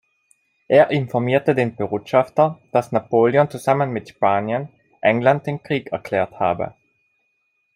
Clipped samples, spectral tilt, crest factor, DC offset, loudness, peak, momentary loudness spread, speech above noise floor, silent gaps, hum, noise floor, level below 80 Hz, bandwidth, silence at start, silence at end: under 0.1%; -7.5 dB/octave; 18 dB; under 0.1%; -19 LUFS; -2 dBFS; 9 LU; 50 dB; none; none; -69 dBFS; -62 dBFS; 15.5 kHz; 0.7 s; 1.05 s